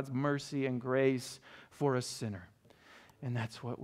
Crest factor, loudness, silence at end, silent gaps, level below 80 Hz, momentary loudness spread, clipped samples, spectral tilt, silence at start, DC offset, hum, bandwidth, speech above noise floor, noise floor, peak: 18 dB; -35 LUFS; 0 s; none; -74 dBFS; 15 LU; under 0.1%; -6 dB/octave; 0 s; under 0.1%; none; 15.5 kHz; 25 dB; -60 dBFS; -18 dBFS